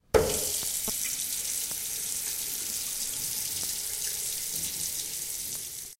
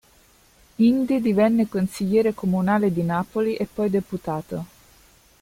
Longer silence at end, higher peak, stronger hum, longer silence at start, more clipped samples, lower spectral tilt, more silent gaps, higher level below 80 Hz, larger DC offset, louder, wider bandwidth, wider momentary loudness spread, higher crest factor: second, 0.05 s vs 0.75 s; about the same, -8 dBFS vs -6 dBFS; neither; second, 0.15 s vs 0.8 s; neither; second, -1 dB/octave vs -7.5 dB/octave; neither; about the same, -50 dBFS vs -54 dBFS; neither; second, -29 LUFS vs -22 LUFS; about the same, 16.5 kHz vs 16 kHz; second, 4 LU vs 11 LU; first, 24 dB vs 16 dB